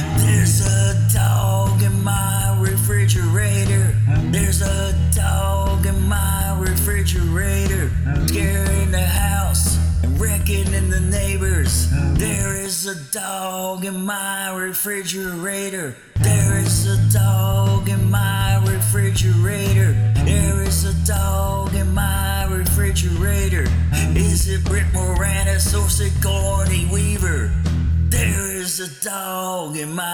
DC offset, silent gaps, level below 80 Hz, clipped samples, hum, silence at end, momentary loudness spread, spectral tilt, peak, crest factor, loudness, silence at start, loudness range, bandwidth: 1%; none; -24 dBFS; under 0.1%; none; 0 s; 7 LU; -5 dB/octave; -2 dBFS; 16 dB; -19 LUFS; 0 s; 4 LU; 19.5 kHz